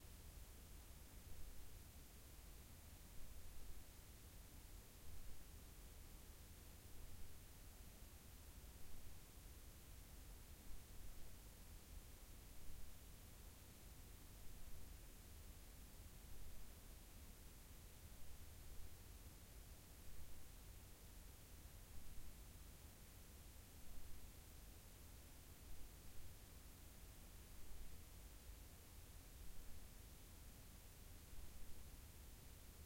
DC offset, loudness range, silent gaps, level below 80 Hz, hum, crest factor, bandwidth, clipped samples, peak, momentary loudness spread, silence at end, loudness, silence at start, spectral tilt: under 0.1%; 0 LU; none; -62 dBFS; none; 16 dB; 16.5 kHz; under 0.1%; -40 dBFS; 1 LU; 0 s; -62 LUFS; 0 s; -3.5 dB/octave